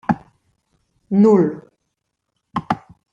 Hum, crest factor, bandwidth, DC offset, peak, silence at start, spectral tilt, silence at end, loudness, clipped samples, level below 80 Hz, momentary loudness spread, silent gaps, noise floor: none; 18 dB; 7.4 kHz; under 0.1%; -4 dBFS; 0.1 s; -9 dB/octave; 0.35 s; -18 LUFS; under 0.1%; -58 dBFS; 16 LU; none; -75 dBFS